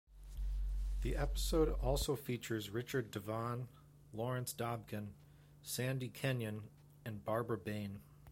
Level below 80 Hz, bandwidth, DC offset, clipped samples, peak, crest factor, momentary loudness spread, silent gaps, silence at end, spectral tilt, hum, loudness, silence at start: -46 dBFS; 16.5 kHz; under 0.1%; under 0.1%; -22 dBFS; 18 dB; 14 LU; none; 0 s; -5.5 dB/octave; none; -41 LUFS; 0.1 s